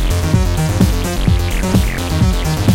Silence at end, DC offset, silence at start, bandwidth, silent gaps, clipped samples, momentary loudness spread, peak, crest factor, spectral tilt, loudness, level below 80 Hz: 0 s; under 0.1%; 0 s; 17 kHz; none; under 0.1%; 2 LU; 0 dBFS; 14 dB; -5.5 dB/octave; -16 LUFS; -18 dBFS